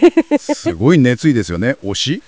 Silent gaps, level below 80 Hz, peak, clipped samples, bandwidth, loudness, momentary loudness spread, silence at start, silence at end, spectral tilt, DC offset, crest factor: none; -40 dBFS; 0 dBFS; under 0.1%; 8 kHz; -14 LUFS; 7 LU; 0 s; 0.1 s; -6 dB/octave; under 0.1%; 14 dB